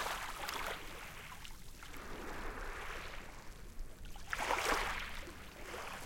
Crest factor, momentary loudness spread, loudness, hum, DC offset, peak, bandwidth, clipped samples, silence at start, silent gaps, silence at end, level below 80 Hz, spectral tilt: 24 dB; 18 LU; -42 LUFS; none; under 0.1%; -20 dBFS; 17 kHz; under 0.1%; 0 s; none; 0 s; -50 dBFS; -2.5 dB/octave